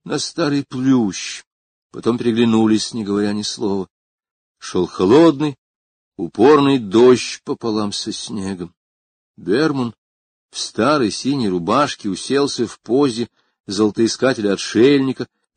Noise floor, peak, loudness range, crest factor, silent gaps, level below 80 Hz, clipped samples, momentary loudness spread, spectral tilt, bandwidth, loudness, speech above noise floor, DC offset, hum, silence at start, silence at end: under -90 dBFS; 0 dBFS; 6 LU; 18 dB; 1.47-1.90 s, 3.90-4.18 s, 4.31-4.55 s, 5.58-6.12 s, 8.77-9.34 s, 9.98-10.49 s, 13.60-13.64 s; -54 dBFS; under 0.1%; 15 LU; -5 dB/octave; 9.6 kHz; -17 LUFS; over 73 dB; under 0.1%; none; 0.05 s; 0.3 s